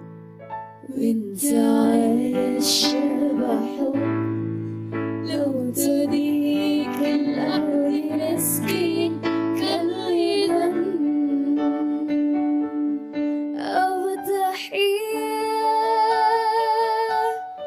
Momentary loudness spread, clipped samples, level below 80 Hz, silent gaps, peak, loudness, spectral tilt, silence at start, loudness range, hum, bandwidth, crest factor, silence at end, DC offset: 7 LU; under 0.1%; -64 dBFS; none; -8 dBFS; -22 LUFS; -4.5 dB/octave; 0 s; 3 LU; none; 15.5 kHz; 14 dB; 0 s; under 0.1%